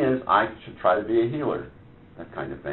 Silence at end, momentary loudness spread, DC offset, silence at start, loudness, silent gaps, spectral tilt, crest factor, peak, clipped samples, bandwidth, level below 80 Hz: 0 s; 17 LU; under 0.1%; 0 s; -25 LUFS; none; -5 dB/octave; 20 dB; -6 dBFS; under 0.1%; 4.2 kHz; -54 dBFS